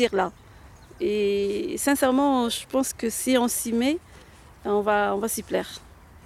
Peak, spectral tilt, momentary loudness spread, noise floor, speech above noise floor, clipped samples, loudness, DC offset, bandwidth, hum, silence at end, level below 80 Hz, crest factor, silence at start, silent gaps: -8 dBFS; -3.5 dB/octave; 9 LU; -49 dBFS; 25 dB; under 0.1%; -24 LUFS; under 0.1%; 16 kHz; none; 0.4 s; -52 dBFS; 16 dB; 0 s; none